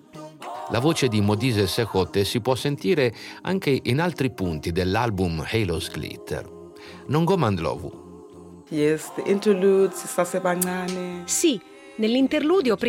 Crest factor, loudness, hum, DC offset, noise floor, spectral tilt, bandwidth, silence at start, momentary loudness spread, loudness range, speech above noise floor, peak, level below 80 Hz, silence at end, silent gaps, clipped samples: 18 dB; -23 LUFS; none; under 0.1%; -44 dBFS; -5 dB/octave; 16.5 kHz; 0.15 s; 15 LU; 4 LU; 21 dB; -6 dBFS; -54 dBFS; 0 s; none; under 0.1%